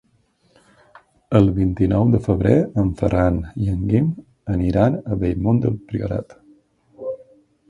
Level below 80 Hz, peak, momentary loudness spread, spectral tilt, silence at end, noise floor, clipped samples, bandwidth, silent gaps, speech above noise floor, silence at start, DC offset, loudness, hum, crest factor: -36 dBFS; 0 dBFS; 13 LU; -10 dB/octave; 0.55 s; -61 dBFS; under 0.1%; 7.4 kHz; none; 43 dB; 1.3 s; under 0.1%; -19 LUFS; none; 20 dB